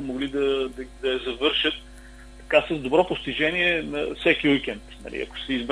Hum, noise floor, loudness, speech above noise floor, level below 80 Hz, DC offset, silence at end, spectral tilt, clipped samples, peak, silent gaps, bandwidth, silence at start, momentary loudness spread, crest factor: none; -44 dBFS; -24 LUFS; 20 dB; -46 dBFS; under 0.1%; 0 s; -5 dB/octave; under 0.1%; -4 dBFS; none; 11 kHz; 0 s; 12 LU; 22 dB